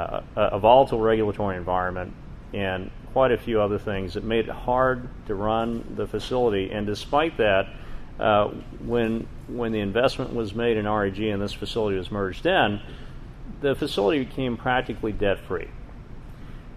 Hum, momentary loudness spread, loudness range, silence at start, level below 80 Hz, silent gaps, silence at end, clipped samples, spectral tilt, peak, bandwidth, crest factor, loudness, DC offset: none; 16 LU; 3 LU; 0 s; -40 dBFS; none; 0 s; under 0.1%; -6.5 dB/octave; -4 dBFS; 13.5 kHz; 22 dB; -25 LUFS; under 0.1%